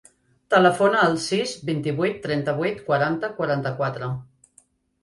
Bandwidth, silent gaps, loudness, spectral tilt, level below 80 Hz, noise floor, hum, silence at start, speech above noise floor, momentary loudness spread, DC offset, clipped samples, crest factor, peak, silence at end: 11.5 kHz; none; -22 LUFS; -5.5 dB/octave; -60 dBFS; -59 dBFS; none; 0.5 s; 37 dB; 9 LU; under 0.1%; under 0.1%; 20 dB; -4 dBFS; 0.8 s